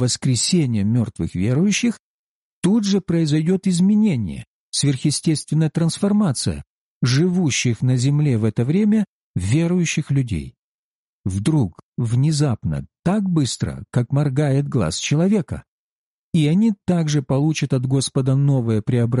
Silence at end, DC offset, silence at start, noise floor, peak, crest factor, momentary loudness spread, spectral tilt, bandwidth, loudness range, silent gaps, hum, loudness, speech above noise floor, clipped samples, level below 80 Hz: 0 s; under 0.1%; 0 s; under -90 dBFS; -8 dBFS; 12 dB; 8 LU; -6 dB/octave; 11.5 kHz; 3 LU; 1.99-2.62 s, 4.47-4.72 s, 6.67-7.01 s, 9.08-9.34 s, 10.58-11.24 s, 11.83-11.92 s, 12.99-13.03 s, 15.68-16.33 s; none; -20 LUFS; over 72 dB; under 0.1%; -46 dBFS